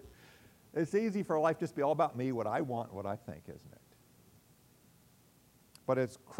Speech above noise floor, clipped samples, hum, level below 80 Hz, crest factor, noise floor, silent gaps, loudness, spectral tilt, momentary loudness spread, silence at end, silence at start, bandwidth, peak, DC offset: 31 dB; under 0.1%; none; -72 dBFS; 20 dB; -65 dBFS; none; -34 LUFS; -7 dB/octave; 14 LU; 0 s; 0.05 s; 16 kHz; -16 dBFS; under 0.1%